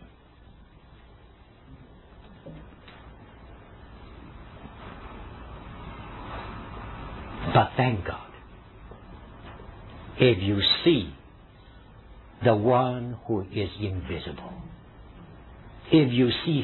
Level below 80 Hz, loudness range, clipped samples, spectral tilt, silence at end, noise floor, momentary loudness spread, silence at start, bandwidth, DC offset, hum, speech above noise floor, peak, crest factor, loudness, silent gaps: -48 dBFS; 22 LU; under 0.1%; -9.5 dB/octave; 0 s; -52 dBFS; 27 LU; 0 s; 4.3 kHz; under 0.1%; none; 28 dB; -6 dBFS; 24 dB; -25 LUFS; none